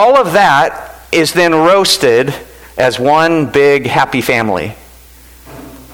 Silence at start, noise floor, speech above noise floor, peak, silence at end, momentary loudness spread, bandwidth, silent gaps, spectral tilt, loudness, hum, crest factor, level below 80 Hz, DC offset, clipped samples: 0 s; -38 dBFS; 28 dB; 0 dBFS; 0.1 s; 11 LU; over 20 kHz; none; -4 dB/octave; -10 LUFS; none; 10 dB; -42 dBFS; under 0.1%; under 0.1%